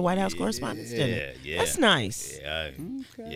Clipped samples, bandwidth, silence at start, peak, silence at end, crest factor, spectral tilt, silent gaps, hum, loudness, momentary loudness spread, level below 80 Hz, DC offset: under 0.1%; 16 kHz; 0 s; -8 dBFS; 0 s; 20 dB; -3.5 dB/octave; none; none; -27 LUFS; 14 LU; -50 dBFS; under 0.1%